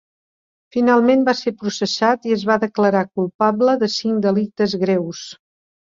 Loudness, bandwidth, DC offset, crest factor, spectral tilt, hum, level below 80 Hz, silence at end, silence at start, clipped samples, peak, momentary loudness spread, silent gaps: -18 LUFS; 7.6 kHz; under 0.1%; 16 dB; -5.5 dB/octave; none; -62 dBFS; 0.6 s; 0.75 s; under 0.1%; -2 dBFS; 9 LU; 3.34-3.39 s